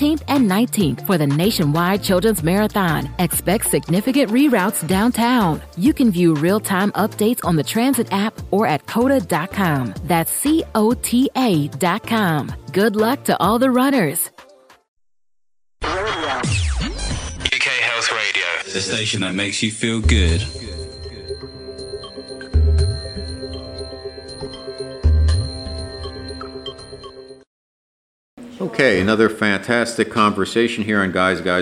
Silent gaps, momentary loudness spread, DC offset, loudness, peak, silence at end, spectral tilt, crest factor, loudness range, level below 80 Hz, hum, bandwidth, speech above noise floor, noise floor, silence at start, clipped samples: 14.88-14.97 s, 27.47-28.37 s; 15 LU; under 0.1%; -18 LUFS; -2 dBFS; 0 s; -5 dB/octave; 18 dB; 7 LU; -32 dBFS; none; 16 kHz; 71 dB; -88 dBFS; 0 s; under 0.1%